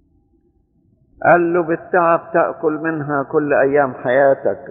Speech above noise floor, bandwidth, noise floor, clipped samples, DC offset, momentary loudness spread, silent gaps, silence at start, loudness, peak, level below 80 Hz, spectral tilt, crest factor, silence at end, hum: 43 dB; 3.9 kHz; -59 dBFS; under 0.1%; under 0.1%; 6 LU; none; 1.2 s; -16 LUFS; -2 dBFS; -58 dBFS; -6.5 dB/octave; 16 dB; 0 s; none